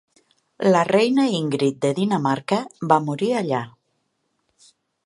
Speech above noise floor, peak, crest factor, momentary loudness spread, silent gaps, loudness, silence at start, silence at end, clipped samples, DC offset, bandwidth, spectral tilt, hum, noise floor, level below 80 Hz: 52 dB; -2 dBFS; 20 dB; 7 LU; none; -21 LUFS; 0.6 s; 1.35 s; under 0.1%; under 0.1%; 11.5 kHz; -6 dB/octave; none; -72 dBFS; -70 dBFS